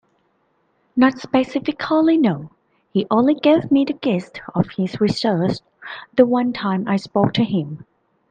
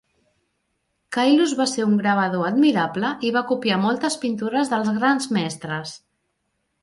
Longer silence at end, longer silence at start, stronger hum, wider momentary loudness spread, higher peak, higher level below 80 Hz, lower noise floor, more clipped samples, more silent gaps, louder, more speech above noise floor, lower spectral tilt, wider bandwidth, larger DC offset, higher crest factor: second, 0.55 s vs 0.85 s; second, 0.95 s vs 1.1 s; neither; about the same, 11 LU vs 9 LU; first, 0 dBFS vs -6 dBFS; first, -56 dBFS vs -68 dBFS; second, -65 dBFS vs -73 dBFS; neither; neither; about the same, -19 LUFS vs -21 LUFS; second, 46 dB vs 53 dB; first, -7.5 dB/octave vs -4.5 dB/octave; second, 9.2 kHz vs 11.5 kHz; neither; about the same, 18 dB vs 16 dB